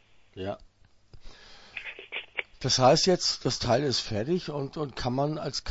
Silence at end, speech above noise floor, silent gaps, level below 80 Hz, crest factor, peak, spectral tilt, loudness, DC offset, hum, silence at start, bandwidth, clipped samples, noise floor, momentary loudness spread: 0 s; 27 dB; none; -52 dBFS; 20 dB; -8 dBFS; -4 dB/octave; -27 LUFS; under 0.1%; none; 0.35 s; 8 kHz; under 0.1%; -53 dBFS; 18 LU